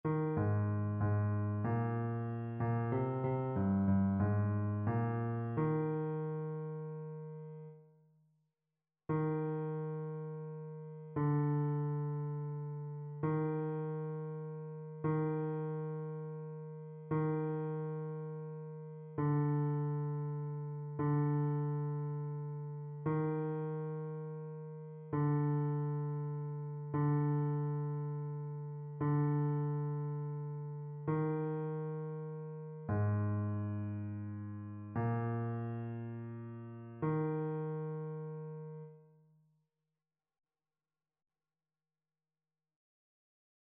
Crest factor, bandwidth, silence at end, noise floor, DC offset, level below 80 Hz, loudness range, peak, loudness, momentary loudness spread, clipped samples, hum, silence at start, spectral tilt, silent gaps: 16 dB; 3.2 kHz; 4.6 s; under -90 dBFS; under 0.1%; -70 dBFS; 7 LU; -22 dBFS; -38 LUFS; 12 LU; under 0.1%; none; 0.05 s; -11 dB/octave; none